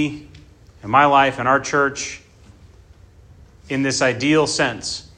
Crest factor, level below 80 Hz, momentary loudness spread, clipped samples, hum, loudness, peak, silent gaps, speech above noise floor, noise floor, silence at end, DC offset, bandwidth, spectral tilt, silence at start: 20 dB; -50 dBFS; 15 LU; under 0.1%; none; -18 LUFS; 0 dBFS; none; 28 dB; -47 dBFS; 0.15 s; under 0.1%; 10 kHz; -4 dB/octave; 0 s